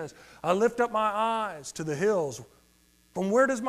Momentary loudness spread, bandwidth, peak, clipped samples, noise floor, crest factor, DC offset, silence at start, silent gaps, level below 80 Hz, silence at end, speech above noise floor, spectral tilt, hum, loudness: 12 LU; 15 kHz; -12 dBFS; under 0.1%; -63 dBFS; 16 dB; under 0.1%; 0 s; none; -66 dBFS; 0 s; 36 dB; -5 dB/octave; none; -28 LUFS